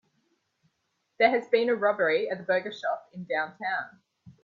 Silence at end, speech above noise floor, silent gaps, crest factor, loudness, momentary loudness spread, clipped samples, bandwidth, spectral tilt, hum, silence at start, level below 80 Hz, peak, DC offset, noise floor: 0.1 s; 50 dB; none; 22 dB; -27 LUFS; 9 LU; under 0.1%; 7.2 kHz; -5.5 dB/octave; none; 1.2 s; -78 dBFS; -8 dBFS; under 0.1%; -77 dBFS